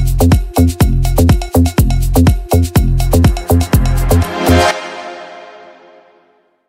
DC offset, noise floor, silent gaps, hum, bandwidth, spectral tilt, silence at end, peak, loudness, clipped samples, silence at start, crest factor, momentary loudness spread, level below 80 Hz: under 0.1%; -54 dBFS; none; none; 16.5 kHz; -6 dB/octave; 1.1 s; 0 dBFS; -12 LUFS; under 0.1%; 0 s; 12 dB; 13 LU; -16 dBFS